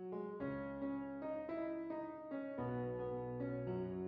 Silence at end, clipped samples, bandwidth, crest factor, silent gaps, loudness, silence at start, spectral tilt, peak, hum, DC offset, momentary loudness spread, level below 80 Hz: 0 s; under 0.1%; 5 kHz; 12 dB; none; -44 LUFS; 0 s; -8.5 dB/octave; -32 dBFS; none; under 0.1%; 4 LU; -68 dBFS